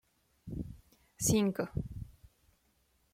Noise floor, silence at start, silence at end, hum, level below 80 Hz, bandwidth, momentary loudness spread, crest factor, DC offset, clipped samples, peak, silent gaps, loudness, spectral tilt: -73 dBFS; 0.45 s; 1 s; none; -54 dBFS; 16.5 kHz; 20 LU; 20 dB; under 0.1%; under 0.1%; -18 dBFS; none; -34 LUFS; -5 dB/octave